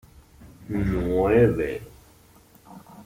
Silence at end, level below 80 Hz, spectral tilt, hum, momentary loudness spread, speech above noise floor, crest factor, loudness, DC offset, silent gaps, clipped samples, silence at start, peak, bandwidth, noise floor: 0.05 s; -40 dBFS; -8.5 dB/octave; none; 13 LU; 32 dB; 18 dB; -23 LUFS; under 0.1%; none; under 0.1%; 0.4 s; -6 dBFS; 16 kHz; -54 dBFS